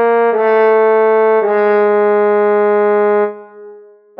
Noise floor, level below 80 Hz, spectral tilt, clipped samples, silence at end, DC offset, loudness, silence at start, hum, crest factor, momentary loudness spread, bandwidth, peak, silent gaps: -39 dBFS; -78 dBFS; -9 dB/octave; under 0.1%; 0.4 s; under 0.1%; -12 LUFS; 0 s; none; 10 dB; 2 LU; 4.2 kHz; -2 dBFS; none